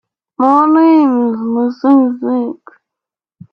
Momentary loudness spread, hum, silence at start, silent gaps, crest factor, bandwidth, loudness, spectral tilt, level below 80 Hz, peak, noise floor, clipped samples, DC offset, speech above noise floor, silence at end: 9 LU; none; 0.4 s; none; 12 dB; 5.8 kHz; -12 LUFS; -8.5 dB/octave; -64 dBFS; 0 dBFS; -84 dBFS; under 0.1%; under 0.1%; 74 dB; 0.95 s